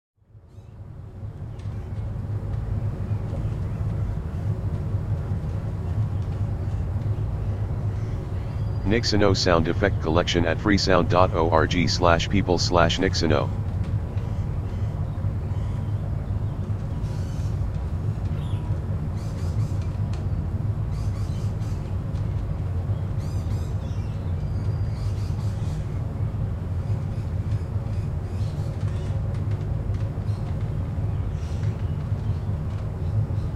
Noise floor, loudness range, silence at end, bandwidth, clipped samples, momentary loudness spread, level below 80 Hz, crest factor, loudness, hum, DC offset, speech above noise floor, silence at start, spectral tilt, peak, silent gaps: -47 dBFS; 7 LU; 0 s; 8.8 kHz; under 0.1%; 9 LU; -34 dBFS; 24 dB; -26 LUFS; none; under 0.1%; 26 dB; 0.35 s; -6.5 dB/octave; -2 dBFS; none